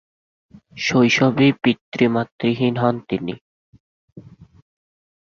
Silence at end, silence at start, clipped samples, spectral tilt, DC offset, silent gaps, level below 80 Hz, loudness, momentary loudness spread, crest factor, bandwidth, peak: 0.75 s; 0.75 s; under 0.1%; -6 dB/octave; under 0.1%; 1.81-1.92 s, 2.32-2.39 s, 3.41-3.73 s, 3.80-4.16 s; -58 dBFS; -19 LUFS; 11 LU; 18 dB; 7.2 kHz; -2 dBFS